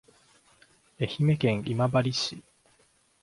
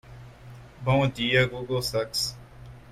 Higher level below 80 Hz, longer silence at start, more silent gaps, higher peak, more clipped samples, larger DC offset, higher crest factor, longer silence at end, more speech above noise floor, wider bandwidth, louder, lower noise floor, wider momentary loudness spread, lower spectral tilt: second, -60 dBFS vs -50 dBFS; first, 1 s vs 0.05 s; neither; about the same, -10 dBFS vs -8 dBFS; neither; neither; about the same, 20 dB vs 20 dB; first, 0.85 s vs 0 s; first, 39 dB vs 21 dB; second, 11.5 kHz vs 15.5 kHz; about the same, -27 LUFS vs -26 LUFS; first, -65 dBFS vs -46 dBFS; second, 9 LU vs 24 LU; first, -6 dB/octave vs -4.5 dB/octave